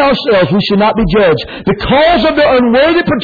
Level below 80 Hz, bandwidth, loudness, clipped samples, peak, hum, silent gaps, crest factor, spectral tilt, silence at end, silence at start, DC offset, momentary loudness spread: -30 dBFS; 5 kHz; -10 LUFS; under 0.1%; -2 dBFS; none; none; 8 dB; -8 dB/octave; 0 s; 0 s; under 0.1%; 4 LU